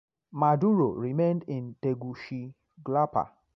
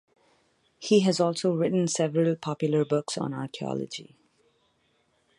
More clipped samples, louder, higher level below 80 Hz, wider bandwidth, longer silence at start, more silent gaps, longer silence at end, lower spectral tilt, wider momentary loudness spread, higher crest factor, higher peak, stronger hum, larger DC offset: neither; about the same, -28 LUFS vs -26 LUFS; first, -66 dBFS vs -72 dBFS; second, 6.2 kHz vs 11.5 kHz; second, 0.35 s vs 0.8 s; neither; second, 0.3 s vs 1.35 s; first, -10.5 dB/octave vs -5.5 dB/octave; first, 15 LU vs 11 LU; about the same, 18 dB vs 18 dB; about the same, -10 dBFS vs -10 dBFS; neither; neither